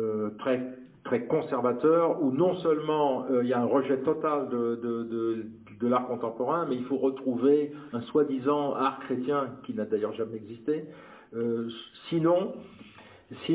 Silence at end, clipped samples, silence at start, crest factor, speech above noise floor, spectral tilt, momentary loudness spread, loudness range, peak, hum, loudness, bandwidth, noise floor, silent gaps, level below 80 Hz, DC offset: 0 s; under 0.1%; 0 s; 16 dB; 20 dB; -10.5 dB/octave; 12 LU; 5 LU; -12 dBFS; none; -28 LUFS; 4 kHz; -48 dBFS; none; -72 dBFS; under 0.1%